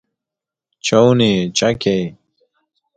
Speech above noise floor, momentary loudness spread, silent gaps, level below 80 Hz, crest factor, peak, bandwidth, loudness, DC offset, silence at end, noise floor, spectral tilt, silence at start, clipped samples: 72 dB; 10 LU; none; -52 dBFS; 18 dB; 0 dBFS; 9.4 kHz; -15 LUFS; under 0.1%; 0.85 s; -86 dBFS; -5 dB/octave; 0.85 s; under 0.1%